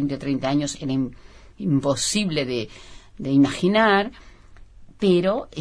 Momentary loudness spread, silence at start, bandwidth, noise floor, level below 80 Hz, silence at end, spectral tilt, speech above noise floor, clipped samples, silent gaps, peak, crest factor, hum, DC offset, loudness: 12 LU; 0 s; 11 kHz; -45 dBFS; -48 dBFS; 0 s; -5 dB/octave; 24 dB; under 0.1%; none; -6 dBFS; 16 dB; none; under 0.1%; -22 LUFS